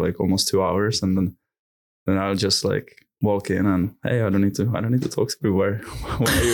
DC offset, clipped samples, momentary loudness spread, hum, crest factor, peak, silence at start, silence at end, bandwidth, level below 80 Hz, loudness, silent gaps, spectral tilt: under 0.1%; under 0.1%; 6 LU; none; 12 dB; -10 dBFS; 0 s; 0 s; 19.5 kHz; -42 dBFS; -22 LUFS; 1.59-2.06 s; -5 dB/octave